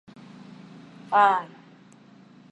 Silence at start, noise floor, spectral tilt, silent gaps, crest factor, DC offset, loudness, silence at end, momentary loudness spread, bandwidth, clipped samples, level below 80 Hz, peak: 1.1 s; -52 dBFS; -5 dB/octave; none; 22 dB; under 0.1%; -22 LUFS; 1.05 s; 27 LU; 8.6 kHz; under 0.1%; -80 dBFS; -6 dBFS